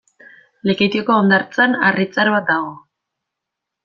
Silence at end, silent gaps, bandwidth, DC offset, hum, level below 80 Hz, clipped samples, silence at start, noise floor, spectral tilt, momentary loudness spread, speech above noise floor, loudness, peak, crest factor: 1.05 s; none; 7 kHz; under 0.1%; none; -60 dBFS; under 0.1%; 0.65 s; -81 dBFS; -6.5 dB/octave; 7 LU; 65 dB; -16 LUFS; -2 dBFS; 16 dB